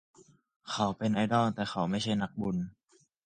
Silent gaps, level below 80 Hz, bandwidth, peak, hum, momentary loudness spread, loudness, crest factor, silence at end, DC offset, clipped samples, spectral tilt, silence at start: none; -62 dBFS; 9.4 kHz; -14 dBFS; none; 10 LU; -31 LUFS; 18 dB; 0.55 s; under 0.1%; under 0.1%; -6 dB/octave; 0.65 s